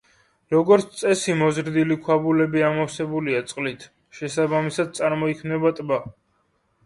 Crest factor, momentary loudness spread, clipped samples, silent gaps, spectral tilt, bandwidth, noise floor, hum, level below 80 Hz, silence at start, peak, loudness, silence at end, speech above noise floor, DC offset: 18 dB; 10 LU; under 0.1%; none; -5.5 dB/octave; 11.5 kHz; -67 dBFS; none; -62 dBFS; 0.5 s; -4 dBFS; -22 LUFS; 0.75 s; 46 dB; under 0.1%